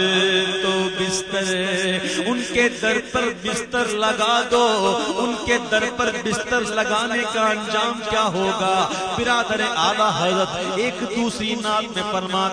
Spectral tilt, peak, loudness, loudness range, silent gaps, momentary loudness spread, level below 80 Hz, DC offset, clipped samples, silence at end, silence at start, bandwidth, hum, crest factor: -3 dB/octave; -4 dBFS; -20 LUFS; 1 LU; none; 5 LU; -50 dBFS; under 0.1%; under 0.1%; 0 s; 0 s; 10.5 kHz; none; 18 dB